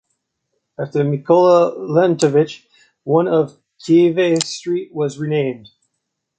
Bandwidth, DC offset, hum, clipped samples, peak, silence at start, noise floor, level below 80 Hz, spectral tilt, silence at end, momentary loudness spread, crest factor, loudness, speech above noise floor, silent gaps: 9.4 kHz; under 0.1%; none; under 0.1%; -2 dBFS; 0.8 s; -76 dBFS; -66 dBFS; -6 dB/octave; 0.8 s; 13 LU; 16 dB; -16 LUFS; 60 dB; none